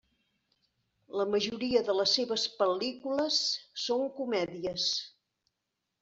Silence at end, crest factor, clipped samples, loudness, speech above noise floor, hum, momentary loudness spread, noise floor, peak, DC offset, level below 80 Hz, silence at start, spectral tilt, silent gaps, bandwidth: 0.95 s; 20 dB; under 0.1%; -30 LUFS; 54 dB; none; 7 LU; -85 dBFS; -14 dBFS; under 0.1%; -70 dBFS; 1.1 s; -3 dB/octave; none; 8 kHz